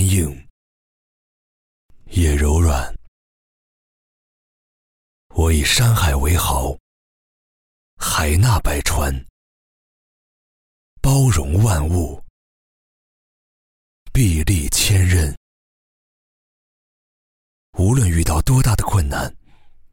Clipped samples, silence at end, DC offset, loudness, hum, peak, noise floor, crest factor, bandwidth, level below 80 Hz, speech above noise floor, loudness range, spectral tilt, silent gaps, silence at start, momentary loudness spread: under 0.1%; 0.25 s; under 0.1%; -18 LUFS; none; -4 dBFS; -44 dBFS; 16 dB; 17 kHz; -26 dBFS; 28 dB; 3 LU; -4.5 dB/octave; 0.50-1.89 s, 3.08-5.30 s, 6.80-7.97 s, 9.30-10.97 s, 12.30-14.06 s, 15.37-17.73 s; 0 s; 11 LU